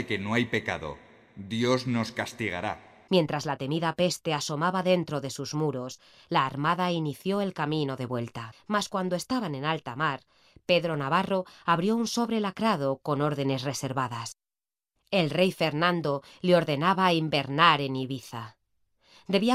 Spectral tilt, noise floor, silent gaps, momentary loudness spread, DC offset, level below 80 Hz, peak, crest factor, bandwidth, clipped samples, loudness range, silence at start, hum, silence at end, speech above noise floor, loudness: -5 dB/octave; under -90 dBFS; none; 11 LU; under 0.1%; -66 dBFS; -4 dBFS; 24 dB; 15.5 kHz; under 0.1%; 5 LU; 0 s; none; 0 s; over 62 dB; -28 LUFS